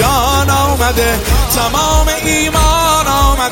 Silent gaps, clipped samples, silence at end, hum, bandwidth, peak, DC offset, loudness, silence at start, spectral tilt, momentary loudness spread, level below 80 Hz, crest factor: none; under 0.1%; 0 s; none; 17 kHz; 0 dBFS; under 0.1%; -12 LUFS; 0 s; -3.5 dB/octave; 2 LU; -16 dBFS; 12 dB